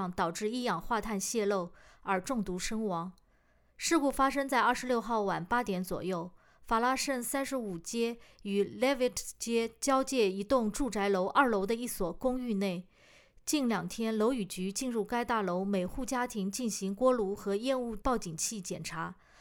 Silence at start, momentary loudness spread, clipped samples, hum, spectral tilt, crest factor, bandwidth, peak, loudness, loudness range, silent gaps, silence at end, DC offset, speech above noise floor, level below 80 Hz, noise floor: 0 s; 8 LU; under 0.1%; none; -4 dB/octave; 20 dB; over 20 kHz; -12 dBFS; -32 LUFS; 3 LU; none; 0.3 s; under 0.1%; 35 dB; -54 dBFS; -67 dBFS